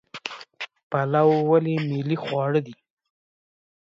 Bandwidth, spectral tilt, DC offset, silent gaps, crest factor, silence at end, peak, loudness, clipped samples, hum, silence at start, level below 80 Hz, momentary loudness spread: 7.6 kHz; -8 dB/octave; under 0.1%; 0.83-0.90 s; 18 dB; 1.15 s; -6 dBFS; -23 LUFS; under 0.1%; none; 0.15 s; -72 dBFS; 17 LU